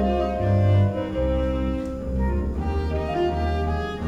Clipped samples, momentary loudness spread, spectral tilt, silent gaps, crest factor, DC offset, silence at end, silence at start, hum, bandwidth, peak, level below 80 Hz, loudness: under 0.1%; 7 LU; -8.5 dB/octave; none; 12 dB; under 0.1%; 0 s; 0 s; none; 7.4 kHz; -10 dBFS; -28 dBFS; -24 LUFS